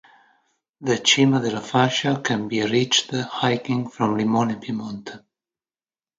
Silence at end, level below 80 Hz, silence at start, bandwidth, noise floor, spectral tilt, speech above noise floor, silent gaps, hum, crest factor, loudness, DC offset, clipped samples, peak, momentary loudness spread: 1 s; -64 dBFS; 0.8 s; 9.4 kHz; under -90 dBFS; -4 dB/octave; over 68 dB; none; none; 20 dB; -21 LUFS; under 0.1%; under 0.1%; -2 dBFS; 13 LU